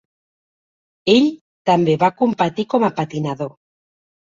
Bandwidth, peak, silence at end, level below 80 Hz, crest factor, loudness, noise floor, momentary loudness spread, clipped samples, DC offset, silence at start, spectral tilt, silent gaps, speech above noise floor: 7.6 kHz; -2 dBFS; 0.85 s; -60 dBFS; 18 dB; -18 LUFS; under -90 dBFS; 10 LU; under 0.1%; under 0.1%; 1.05 s; -6.5 dB/octave; 1.41-1.65 s; over 73 dB